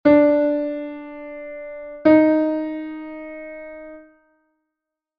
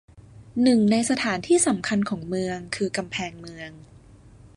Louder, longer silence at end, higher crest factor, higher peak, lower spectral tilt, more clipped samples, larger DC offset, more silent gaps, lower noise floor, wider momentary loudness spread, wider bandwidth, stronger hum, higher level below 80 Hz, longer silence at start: first, -18 LUFS vs -23 LUFS; first, 1.2 s vs 0.1 s; about the same, 18 dB vs 16 dB; first, -4 dBFS vs -8 dBFS; first, -9 dB/octave vs -4 dB/octave; neither; neither; neither; first, -84 dBFS vs -49 dBFS; first, 21 LU vs 17 LU; second, 5.2 kHz vs 11.5 kHz; neither; about the same, -58 dBFS vs -56 dBFS; about the same, 0.05 s vs 0.15 s